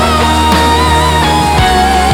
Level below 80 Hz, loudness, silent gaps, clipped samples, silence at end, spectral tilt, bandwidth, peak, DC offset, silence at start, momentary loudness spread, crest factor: -18 dBFS; -9 LUFS; none; under 0.1%; 0 s; -4.5 dB/octave; 18.5 kHz; 0 dBFS; under 0.1%; 0 s; 1 LU; 8 dB